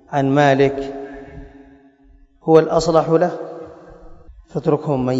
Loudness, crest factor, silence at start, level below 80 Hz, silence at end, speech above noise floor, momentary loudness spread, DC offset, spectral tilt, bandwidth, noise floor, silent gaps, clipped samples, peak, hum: -17 LUFS; 18 dB; 0.1 s; -46 dBFS; 0 s; 34 dB; 22 LU; under 0.1%; -7 dB/octave; 8 kHz; -50 dBFS; none; under 0.1%; 0 dBFS; none